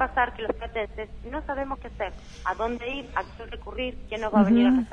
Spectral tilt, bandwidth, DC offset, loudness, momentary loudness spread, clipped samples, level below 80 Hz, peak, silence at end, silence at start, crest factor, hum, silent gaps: -7 dB/octave; 7.2 kHz; under 0.1%; -27 LUFS; 15 LU; under 0.1%; -42 dBFS; -8 dBFS; 0 s; 0 s; 20 dB; none; none